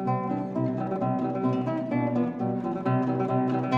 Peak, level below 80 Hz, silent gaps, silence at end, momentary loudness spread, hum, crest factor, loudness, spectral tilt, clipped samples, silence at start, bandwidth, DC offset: -12 dBFS; -62 dBFS; none; 0 s; 3 LU; none; 16 dB; -27 LUFS; -9.5 dB/octave; under 0.1%; 0 s; 6.6 kHz; under 0.1%